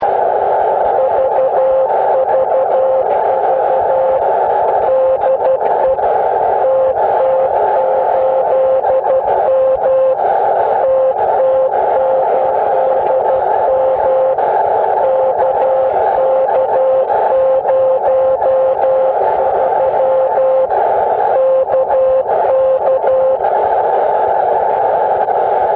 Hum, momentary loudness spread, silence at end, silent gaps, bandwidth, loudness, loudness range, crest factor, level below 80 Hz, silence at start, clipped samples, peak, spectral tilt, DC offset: none; 1 LU; 0 s; none; 4 kHz; -13 LUFS; 0 LU; 10 dB; -50 dBFS; 0 s; under 0.1%; -2 dBFS; -9 dB/octave; under 0.1%